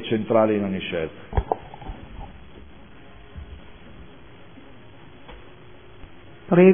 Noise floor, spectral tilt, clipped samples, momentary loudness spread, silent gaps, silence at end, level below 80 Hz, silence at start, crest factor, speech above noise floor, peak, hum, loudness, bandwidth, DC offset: -47 dBFS; -11.5 dB/octave; under 0.1%; 27 LU; none; 0 s; -40 dBFS; 0 s; 22 dB; 24 dB; -2 dBFS; none; -23 LUFS; 3.6 kHz; 0.5%